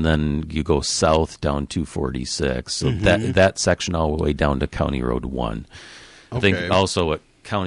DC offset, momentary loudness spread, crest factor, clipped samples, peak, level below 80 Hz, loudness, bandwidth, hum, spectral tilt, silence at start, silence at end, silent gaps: under 0.1%; 10 LU; 16 dB; under 0.1%; -4 dBFS; -32 dBFS; -21 LUFS; 11.5 kHz; none; -5 dB/octave; 0 s; 0 s; none